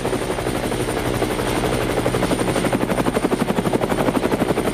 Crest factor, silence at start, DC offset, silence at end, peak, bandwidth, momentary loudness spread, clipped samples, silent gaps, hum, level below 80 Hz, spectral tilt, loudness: 16 dB; 0 s; under 0.1%; 0 s; -4 dBFS; 15.5 kHz; 3 LU; under 0.1%; none; none; -36 dBFS; -5 dB/octave; -21 LUFS